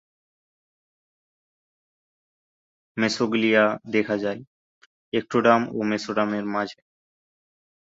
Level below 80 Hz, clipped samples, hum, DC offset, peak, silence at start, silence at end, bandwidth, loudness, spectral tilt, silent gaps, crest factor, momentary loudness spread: -68 dBFS; under 0.1%; none; under 0.1%; -4 dBFS; 2.95 s; 1.2 s; 7.8 kHz; -23 LUFS; -5 dB/octave; 4.47-5.12 s; 22 dB; 10 LU